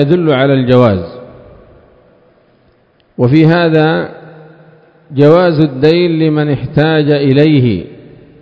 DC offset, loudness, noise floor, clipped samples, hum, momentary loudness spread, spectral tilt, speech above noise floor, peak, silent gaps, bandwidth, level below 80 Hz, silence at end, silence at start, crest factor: under 0.1%; -10 LUFS; -51 dBFS; 1%; none; 12 LU; -9.5 dB/octave; 42 dB; 0 dBFS; none; 5.8 kHz; -42 dBFS; 0.5 s; 0 s; 12 dB